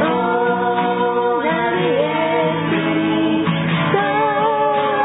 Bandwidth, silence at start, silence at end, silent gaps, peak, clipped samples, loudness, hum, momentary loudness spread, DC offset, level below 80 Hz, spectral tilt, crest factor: 4 kHz; 0 s; 0 s; none; -2 dBFS; under 0.1%; -17 LUFS; none; 1 LU; under 0.1%; -54 dBFS; -11.5 dB/octave; 14 dB